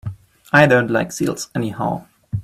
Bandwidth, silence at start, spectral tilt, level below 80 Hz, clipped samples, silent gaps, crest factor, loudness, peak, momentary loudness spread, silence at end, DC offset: 15.5 kHz; 0.05 s; -5.5 dB/octave; -50 dBFS; under 0.1%; none; 18 dB; -18 LUFS; 0 dBFS; 17 LU; 0 s; under 0.1%